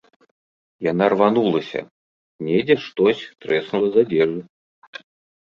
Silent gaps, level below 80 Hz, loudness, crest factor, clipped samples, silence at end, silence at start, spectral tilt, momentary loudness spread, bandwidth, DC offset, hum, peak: 1.91-2.39 s, 4.49-4.93 s; -62 dBFS; -20 LUFS; 18 dB; under 0.1%; 0.45 s; 0.8 s; -7.5 dB/octave; 16 LU; 7 kHz; under 0.1%; none; -2 dBFS